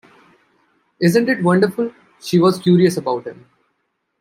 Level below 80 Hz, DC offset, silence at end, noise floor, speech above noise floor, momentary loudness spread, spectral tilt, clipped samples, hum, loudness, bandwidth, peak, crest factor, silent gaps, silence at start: -62 dBFS; under 0.1%; 0.9 s; -71 dBFS; 55 dB; 12 LU; -6.5 dB/octave; under 0.1%; none; -17 LUFS; 15.5 kHz; -2 dBFS; 16 dB; none; 1 s